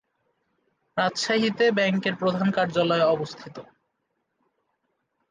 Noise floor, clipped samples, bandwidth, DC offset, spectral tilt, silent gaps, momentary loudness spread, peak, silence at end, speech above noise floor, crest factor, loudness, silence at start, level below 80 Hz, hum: -77 dBFS; under 0.1%; 9.8 kHz; under 0.1%; -5 dB/octave; none; 12 LU; -10 dBFS; 1.7 s; 53 dB; 16 dB; -23 LUFS; 0.95 s; -70 dBFS; none